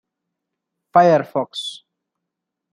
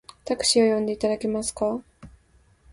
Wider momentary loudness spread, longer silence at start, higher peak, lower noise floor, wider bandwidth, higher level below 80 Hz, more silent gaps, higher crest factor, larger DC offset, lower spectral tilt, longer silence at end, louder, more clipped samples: first, 15 LU vs 10 LU; first, 0.95 s vs 0.25 s; first, -2 dBFS vs -8 dBFS; first, -81 dBFS vs -59 dBFS; about the same, 10.5 kHz vs 11.5 kHz; second, -70 dBFS vs -54 dBFS; neither; about the same, 20 dB vs 18 dB; neither; first, -5.5 dB/octave vs -3 dB/octave; first, 0.95 s vs 0.65 s; first, -17 LUFS vs -24 LUFS; neither